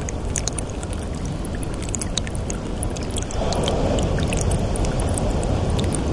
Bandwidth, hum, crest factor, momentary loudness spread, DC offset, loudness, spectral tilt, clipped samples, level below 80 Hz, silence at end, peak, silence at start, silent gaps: 11.5 kHz; none; 20 dB; 6 LU; under 0.1%; -24 LUFS; -5 dB/octave; under 0.1%; -28 dBFS; 0 s; -4 dBFS; 0 s; none